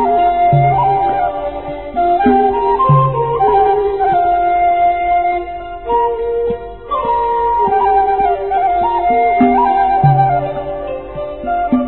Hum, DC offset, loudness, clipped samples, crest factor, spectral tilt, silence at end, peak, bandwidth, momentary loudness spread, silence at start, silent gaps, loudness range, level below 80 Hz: none; 0.8%; -14 LUFS; under 0.1%; 14 dB; -12.5 dB/octave; 0 s; 0 dBFS; 4.2 kHz; 11 LU; 0 s; none; 3 LU; -36 dBFS